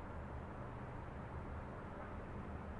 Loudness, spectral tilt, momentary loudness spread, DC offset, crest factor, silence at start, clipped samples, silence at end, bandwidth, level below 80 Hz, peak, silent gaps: -49 LUFS; -8.5 dB/octave; 1 LU; under 0.1%; 12 dB; 0 s; under 0.1%; 0 s; 11 kHz; -54 dBFS; -36 dBFS; none